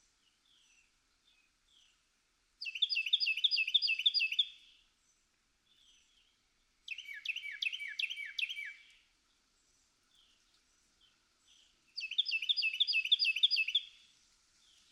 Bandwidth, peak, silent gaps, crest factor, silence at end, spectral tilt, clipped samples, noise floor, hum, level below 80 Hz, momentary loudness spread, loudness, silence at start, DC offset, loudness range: 15 kHz; -18 dBFS; none; 22 dB; 1.05 s; 4.5 dB/octave; under 0.1%; -76 dBFS; none; -84 dBFS; 15 LU; -32 LUFS; 2.6 s; under 0.1%; 12 LU